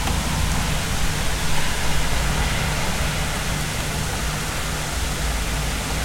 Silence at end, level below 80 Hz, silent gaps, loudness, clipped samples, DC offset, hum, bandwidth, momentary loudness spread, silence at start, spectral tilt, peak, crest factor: 0 s; -26 dBFS; none; -23 LUFS; under 0.1%; under 0.1%; none; 16.5 kHz; 2 LU; 0 s; -3.5 dB/octave; -8 dBFS; 14 dB